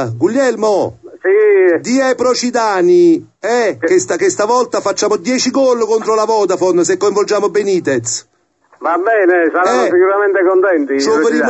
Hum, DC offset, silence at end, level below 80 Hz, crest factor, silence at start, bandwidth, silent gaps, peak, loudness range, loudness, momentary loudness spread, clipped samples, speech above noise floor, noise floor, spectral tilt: none; under 0.1%; 0 s; -58 dBFS; 12 dB; 0 s; 8.4 kHz; none; -2 dBFS; 2 LU; -13 LUFS; 6 LU; under 0.1%; 40 dB; -52 dBFS; -4 dB/octave